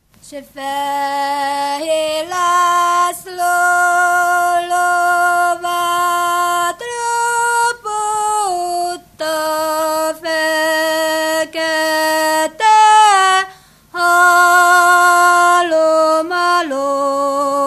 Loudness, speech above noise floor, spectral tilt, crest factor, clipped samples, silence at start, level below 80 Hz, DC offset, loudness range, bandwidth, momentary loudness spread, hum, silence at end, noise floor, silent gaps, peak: -14 LUFS; 19 dB; -0.5 dB/octave; 14 dB; under 0.1%; 0.25 s; -58 dBFS; under 0.1%; 6 LU; 15 kHz; 10 LU; none; 0 s; -39 dBFS; none; 0 dBFS